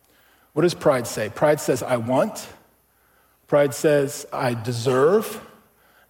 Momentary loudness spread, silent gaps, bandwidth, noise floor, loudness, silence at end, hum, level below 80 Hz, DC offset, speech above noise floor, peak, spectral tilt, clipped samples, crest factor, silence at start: 10 LU; none; 17 kHz; -61 dBFS; -21 LUFS; 0.65 s; none; -62 dBFS; under 0.1%; 40 dB; -6 dBFS; -5.5 dB/octave; under 0.1%; 16 dB; 0.55 s